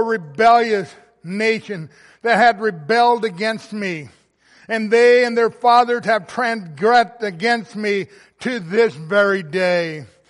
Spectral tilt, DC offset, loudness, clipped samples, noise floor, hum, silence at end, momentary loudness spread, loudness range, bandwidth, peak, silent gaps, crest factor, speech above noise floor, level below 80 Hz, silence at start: -5 dB/octave; under 0.1%; -17 LUFS; under 0.1%; -52 dBFS; none; 0.25 s; 12 LU; 3 LU; 11.5 kHz; -2 dBFS; none; 16 dB; 35 dB; -64 dBFS; 0 s